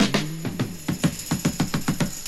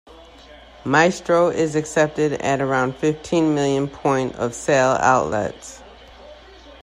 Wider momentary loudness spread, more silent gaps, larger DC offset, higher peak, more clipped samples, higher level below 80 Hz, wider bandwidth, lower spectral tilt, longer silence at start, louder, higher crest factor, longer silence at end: second, 5 LU vs 8 LU; neither; neither; second, -6 dBFS vs -2 dBFS; neither; first, -44 dBFS vs -50 dBFS; first, 16 kHz vs 14 kHz; about the same, -4.5 dB/octave vs -5 dB/octave; about the same, 0 s vs 0.1 s; second, -26 LUFS vs -19 LUFS; about the same, 18 dB vs 20 dB; about the same, 0 s vs 0.1 s